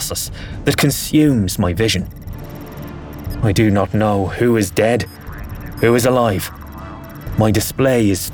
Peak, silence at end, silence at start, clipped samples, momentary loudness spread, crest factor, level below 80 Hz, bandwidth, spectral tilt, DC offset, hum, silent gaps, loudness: 0 dBFS; 0 s; 0 s; under 0.1%; 17 LU; 16 dB; -34 dBFS; 19.5 kHz; -5.5 dB/octave; under 0.1%; none; none; -16 LUFS